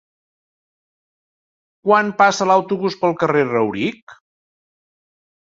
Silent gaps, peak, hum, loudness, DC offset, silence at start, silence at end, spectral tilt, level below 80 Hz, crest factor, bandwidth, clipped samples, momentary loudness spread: 4.02-4.07 s; -2 dBFS; none; -17 LUFS; under 0.1%; 1.85 s; 1.35 s; -5 dB/octave; -64 dBFS; 20 dB; 7.8 kHz; under 0.1%; 10 LU